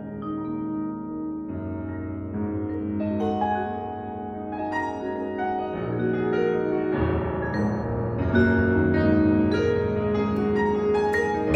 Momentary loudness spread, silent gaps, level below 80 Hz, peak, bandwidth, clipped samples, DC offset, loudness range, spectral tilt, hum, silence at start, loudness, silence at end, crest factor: 11 LU; none; -44 dBFS; -6 dBFS; 8.2 kHz; under 0.1%; under 0.1%; 7 LU; -8.5 dB/octave; none; 0 s; -25 LUFS; 0 s; 18 dB